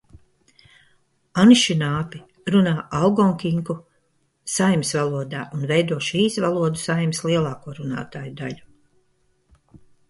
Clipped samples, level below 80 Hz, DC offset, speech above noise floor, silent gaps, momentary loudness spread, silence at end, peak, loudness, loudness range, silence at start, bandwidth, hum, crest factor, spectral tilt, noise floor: under 0.1%; -56 dBFS; under 0.1%; 46 dB; none; 16 LU; 1.5 s; -2 dBFS; -21 LUFS; 6 LU; 1.35 s; 11.5 kHz; none; 20 dB; -5 dB/octave; -66 dBFS